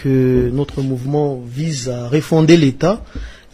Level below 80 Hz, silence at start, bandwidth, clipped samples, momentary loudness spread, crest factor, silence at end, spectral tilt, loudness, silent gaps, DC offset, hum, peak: -34 dBFS; 0 s; 14.5 kHz; under 0.1%; 12 LU; 16 dB; 0.2 s; -7 dB/octave; -16 LUFS; none; under 0.1%; none; 0 dBFS